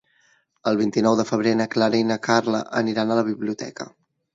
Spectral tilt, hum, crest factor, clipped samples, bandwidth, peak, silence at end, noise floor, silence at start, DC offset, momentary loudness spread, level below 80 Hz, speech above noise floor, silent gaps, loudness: -5.5 dB/octave; none; 20 dB; under 0.1%; 7.8 kHz; -2 dBFS; 0.45 s; -62 dBFS; 0.65 s; under 0.1%; 10 LU; -66 dBFS; 41 dB; none; -22 LUFS